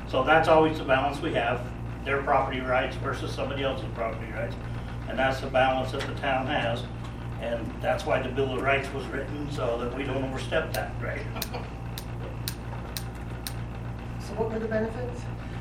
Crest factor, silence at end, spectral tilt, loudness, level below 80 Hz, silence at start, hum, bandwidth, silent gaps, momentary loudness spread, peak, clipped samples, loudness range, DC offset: 22 dB; 0 s; -5.5 dB/octave; -29 LUFS; -40 dBFS; 0 s; none; 17 kHz; none; 12 LU; -6 dBFS; under 0.1%; 6 LU; under 0.1%